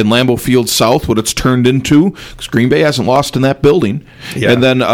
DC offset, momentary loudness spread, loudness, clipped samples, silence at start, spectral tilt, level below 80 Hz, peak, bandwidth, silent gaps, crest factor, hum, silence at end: under 0.1%; 7 LU; -11 LUFS; under 0.1%; 0 s; -5 dB/octave; -36 dBFS; 0 dBFS; 18.5 kHz; none; 12 dB; none; 0 s